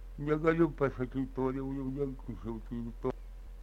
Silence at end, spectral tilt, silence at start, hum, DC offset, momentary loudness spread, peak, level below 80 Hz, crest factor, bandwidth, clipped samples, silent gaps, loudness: 0 s; -9 dB/octave; 0 s; none; under 0.1%; 13 LU; -14 dBFS; -46 dBFS; 20 dB; 8.2 kHz; under 0.1%; none; -34 LUFS